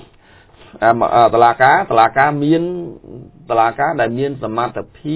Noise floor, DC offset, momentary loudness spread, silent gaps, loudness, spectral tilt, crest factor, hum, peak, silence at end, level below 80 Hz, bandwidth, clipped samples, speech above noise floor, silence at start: -47 dBFS; under 0.1%; 12 LU; none; -14 LUFS; -10 dB/octave; 16 dB; none; 0 dBFS; 0 s; -50 dBFS; 4 kHz; 0.2%; 32 dB; 0.75 s